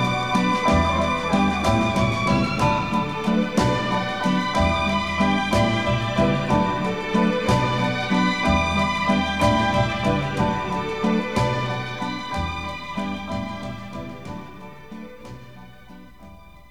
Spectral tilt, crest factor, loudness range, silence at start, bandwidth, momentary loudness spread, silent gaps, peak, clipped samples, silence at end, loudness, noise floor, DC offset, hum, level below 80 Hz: -6 dB/octave; 16 dB; 10 LU; 0 s; 14 kHz; 14 LU; none; -6 dBFS; under 0.1%; 0.05 s; -22 LUFS; -45 dBFS; 0.7%; none; -38 dBFS